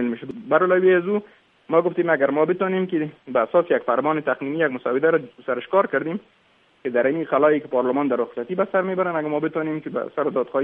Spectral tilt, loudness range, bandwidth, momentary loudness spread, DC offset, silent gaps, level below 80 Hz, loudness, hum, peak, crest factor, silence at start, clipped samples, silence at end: -10 dB/octave; 2 LU; 3.8 kHz; 8 LU; under 0.1%; none; -70 dBFS; -22 LUFS; none; -4 dBFS; 18 dB; 0 s; under 0.1%; 0 s